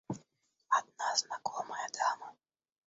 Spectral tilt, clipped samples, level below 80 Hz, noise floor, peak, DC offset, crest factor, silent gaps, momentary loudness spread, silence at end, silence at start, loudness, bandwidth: -0.5 dB/octave; under 0.1%; -80 dBFS; -73 dBFS; -14 dBFS; under 0.1%; 24 dB; none; 12 LU; 0.55 s; 0.1 s; -35 LUFS; 8 kHz